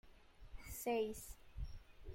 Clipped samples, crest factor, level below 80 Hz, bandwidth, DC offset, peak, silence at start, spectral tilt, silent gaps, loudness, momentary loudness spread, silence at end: under 0.1%; 16 dB; -54 dBFS; 16.5 kHz; under 0.1%; -30 dBFS; 0.05 s; -4.5 dB/octave; none; -45 LUFS; 19 LU; 0 s